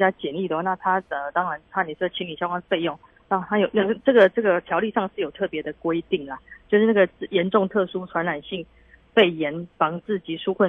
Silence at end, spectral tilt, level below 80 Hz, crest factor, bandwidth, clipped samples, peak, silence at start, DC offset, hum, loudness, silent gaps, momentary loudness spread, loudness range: 0 s; -8 dB/octave; -60 dBFS; 20 dB; 4.3 kHz; under 0.1%; -4 dBFS; 0 s; under 0.1%; none; -23 LUFS; none; 10 LU; 3 LU